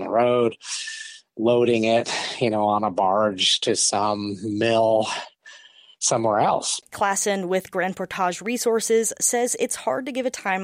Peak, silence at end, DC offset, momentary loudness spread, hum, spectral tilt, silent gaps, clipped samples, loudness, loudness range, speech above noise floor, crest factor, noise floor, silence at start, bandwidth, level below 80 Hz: -8 dBFS; 0 s; under 0.1%; 8 LU; none; -3 dB/octave; none; under 0.1%; -22 LUFS; 3 LU; 27 dB; 14 dB; -49 dBFS; 0 s; 16 kHz; -68 dBFS